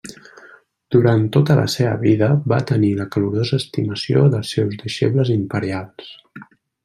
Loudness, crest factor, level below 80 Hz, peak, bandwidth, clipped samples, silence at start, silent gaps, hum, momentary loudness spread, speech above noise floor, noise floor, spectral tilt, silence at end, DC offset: -18 LUFS; 16 dB; -56 dBFS; -2 dBFS; 13.5 kHz; under 0.1%; 0.05 s; none; none; 9 LU; 30 dB; -48 dBFS; -7 dB/octave; 0.4 s; under 0.1%